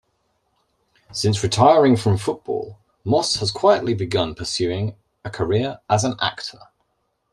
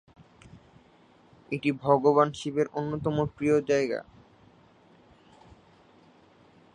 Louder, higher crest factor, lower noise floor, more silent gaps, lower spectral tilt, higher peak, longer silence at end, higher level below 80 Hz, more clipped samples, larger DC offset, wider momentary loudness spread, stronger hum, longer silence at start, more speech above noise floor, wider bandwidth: first, -20 LUFS vs -27 LUFS; about the same, 20 dB vs 24 dB; first, -71 dBFS vs -59 dBFS; neither; second, -5 dB/octave vs -6.5 dB/octave; first, -2 dBFS vs -6 dBFS; second, 0.8 s vs 2.7 s; first, -52 dBFS vs -60 dBFS; neither; neither; first, 17 LU vs 9 LU; neither; first, 1.1 s vs 0.55 s; first, 51 dB vs 33 dB; first, 12.5 kHz vs 10 kHz